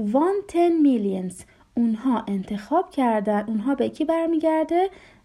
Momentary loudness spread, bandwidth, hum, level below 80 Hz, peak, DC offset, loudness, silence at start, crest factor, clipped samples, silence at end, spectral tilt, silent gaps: 9 LU; 12.5 kHz; none; -58 dBFS; -8 dBFS; under 0.1%; -23 LUFS; 0 s; 14 dB; under 0.1%; 0.3 s; -7 dB/octave; none